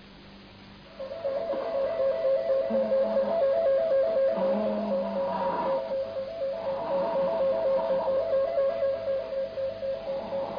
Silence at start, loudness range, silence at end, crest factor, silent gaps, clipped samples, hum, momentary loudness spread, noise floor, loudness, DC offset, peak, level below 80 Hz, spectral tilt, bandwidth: 0 s; 3 LU; 0 s; 10 dB; none; under 0.1%; 50 Hz at -60 dBFS; 8 LU; -49 dBFS; -28 LUFS; under 0.1%; -16 dBFS; -60 dBFS; -8 dB/octave; 5.2 kHz